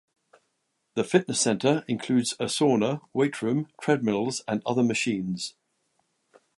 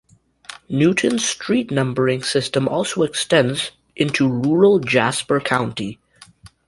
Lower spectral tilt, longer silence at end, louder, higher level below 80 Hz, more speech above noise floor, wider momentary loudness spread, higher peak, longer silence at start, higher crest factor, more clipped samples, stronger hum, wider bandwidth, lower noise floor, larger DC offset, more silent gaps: about the same, -4.5 dB/octave vs -4.5 dB/octave; first, 1.05 s vs 0.2 s; second, -26 LUFS vs -19 LUFS; second, -70 dBFS vs -56 dBFS; first, 51 dB vs 29 dB; second, 7 LU vs 11 LU; second, -6 dBFS vs -2 dBFS; first, 0.95 s vs 0.5 s; about the same, 22 dB vs 18 dB; neither; neither; about the same, 11.5 kHz vs 11.5 kHz; first, -76 dBFS vs -47 dBFS; neither; neither